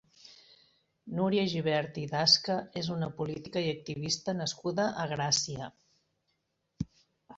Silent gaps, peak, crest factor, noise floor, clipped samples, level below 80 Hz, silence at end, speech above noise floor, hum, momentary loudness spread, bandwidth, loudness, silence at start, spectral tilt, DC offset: none; -10 dBFS; 24 dB; -79 dBFS; under 0.1%; -62 dBFS; 0 s; 48 dB; none; 17 LU; 8 kHz; -30 LUFS; 0.25 s; -3.5 dB/octave; under 0.1%